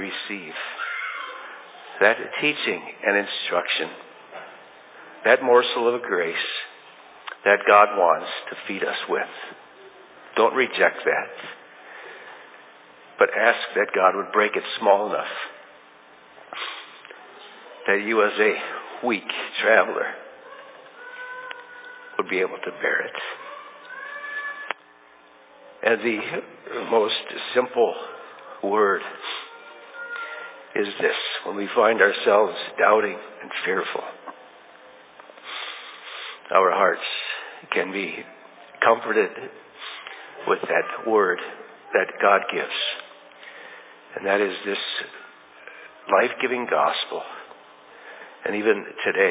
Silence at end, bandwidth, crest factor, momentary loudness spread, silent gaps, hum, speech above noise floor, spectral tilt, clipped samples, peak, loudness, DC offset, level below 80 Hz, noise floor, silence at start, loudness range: 0 s; 4 kHz; 24 dB; 22 LU; none; none; 30 dB; -7 dB/octave; under 0.1%; -2 dBFS; -23 LUFS; under 0.1%; -84 dBFS; -52 dBFS; 0 s; 7 LU